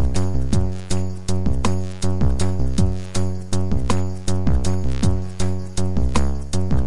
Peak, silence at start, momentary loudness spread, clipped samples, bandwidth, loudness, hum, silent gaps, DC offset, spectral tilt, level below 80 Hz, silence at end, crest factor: -4 dBFS; 0 s; 4 LU; under 0.1%; 11.5 kHz; -23 LUFS; none; none; 9%; -6 dB/octave; -26 dBFS; 0 s; 16 dB